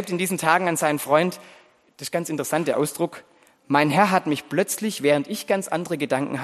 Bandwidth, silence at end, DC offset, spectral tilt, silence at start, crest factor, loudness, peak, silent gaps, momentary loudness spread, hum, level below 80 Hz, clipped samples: 13 kHz; 0 s; under 0.1%; -4.5 dB/octave; 0 s; 20 dB; -22 LUFS; -2 dBFS; none; 8 LU; none; -70 dBFS; under 0.1%